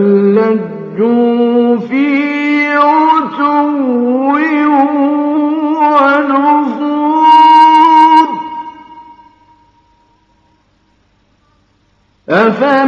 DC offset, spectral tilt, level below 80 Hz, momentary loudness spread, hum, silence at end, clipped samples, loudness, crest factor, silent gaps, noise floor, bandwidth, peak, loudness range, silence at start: under 0.1%; -7 dB/octave; -60 dBFS; 10 LU; none; 0 s; 0.5%; -9 LUFS; 10 dB; none; -54 dBFS; 7 kHz; 0 dBFS; 7 LU; 0 s